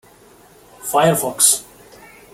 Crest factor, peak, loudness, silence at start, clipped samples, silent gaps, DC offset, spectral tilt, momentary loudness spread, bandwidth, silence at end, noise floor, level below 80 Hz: 20 dB; 0 dBFS; -15 LUFS; 0.8 s; under 0.1%; none; under 0.1%; -2.5 dB/octave; 8 LU; 17 kHz; 0.7 s; -47 dBFS; -58 dBFS